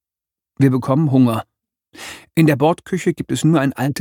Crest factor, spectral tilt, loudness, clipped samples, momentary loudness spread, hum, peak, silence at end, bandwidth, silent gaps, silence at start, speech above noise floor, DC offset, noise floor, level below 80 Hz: 16 dB; -7 dB/octave; -17 LUFS; under 0.1%; 11 LU; none; 0 dBFS; 0 s; 18 kHz; none; 0.6 s; 72 dB; under 0.1%; -88 dBFS; -56 dBFS